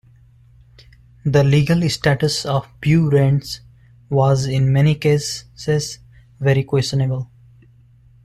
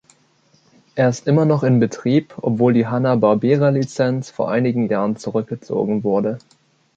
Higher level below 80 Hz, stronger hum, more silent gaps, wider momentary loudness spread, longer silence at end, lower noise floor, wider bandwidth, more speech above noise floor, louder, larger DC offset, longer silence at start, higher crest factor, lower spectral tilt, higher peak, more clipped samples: first, -46 dBFS vs -60 dBFS; neither; neither; first, 12 LU vs 8 LU; first, 1 s vs 0.6 s; second, -49 dBFS vs -58 dBFS; first, 13 kHz vs 8 kHz; second, 33 dB vs 40 dB; about the same, -18 LUFS vs -18 LUFS; neither; first, 1.25 s vs 0.95 s; about the same, 16 dB vs 16 dB; second, -6 dB/octave vs -8 dB/octave; about the same, -4 dBFS vs -2 dBFS; neither